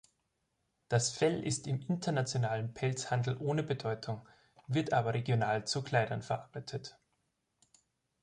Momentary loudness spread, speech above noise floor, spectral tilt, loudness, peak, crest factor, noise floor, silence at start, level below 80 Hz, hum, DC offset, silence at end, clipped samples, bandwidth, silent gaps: 11 LU; 48 dB; -5 dB/octave; -34 LUFS; -16 dBFS; 20 dB; -81 dBFS; 0.9 s; -68 dBFS; none; under 0.1%; 1.35 s; under 0.1%; 11 kHz; none